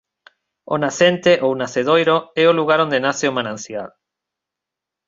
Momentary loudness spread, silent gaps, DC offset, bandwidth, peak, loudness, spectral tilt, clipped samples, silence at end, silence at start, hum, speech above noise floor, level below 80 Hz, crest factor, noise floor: 13 LU; none; under 0.1%; 7.8 kHz; -2 dBFS; -17 LUFS; -4.5 dB/octave; under 0.1%; 1.2 s; 0.7 s; none; 68 dB; -62 dBFS; 18 dB; -85 dBFS